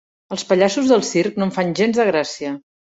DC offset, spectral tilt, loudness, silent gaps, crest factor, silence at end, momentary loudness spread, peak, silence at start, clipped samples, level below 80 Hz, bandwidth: under 0.1%; -5 dB/octave; -18 LUFS; none; 16 dB; 0.3 s; 12 LU; -2 dBFS; 0.3 s; under 0.1%; -60 dBFS; 8 kHz